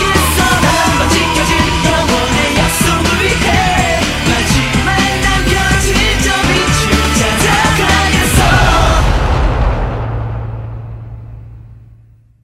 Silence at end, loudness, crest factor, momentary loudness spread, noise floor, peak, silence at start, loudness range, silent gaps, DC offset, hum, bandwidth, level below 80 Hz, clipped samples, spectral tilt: 0.65 s; -11 LUFS; 12 dB; 10 LU; -43 dBFS; 0 dBFS; 0 s; 4 LU; none; under 0.1%; none; 16.5 kHz; -18 dBFS; under 0.1%; -4 dB/octave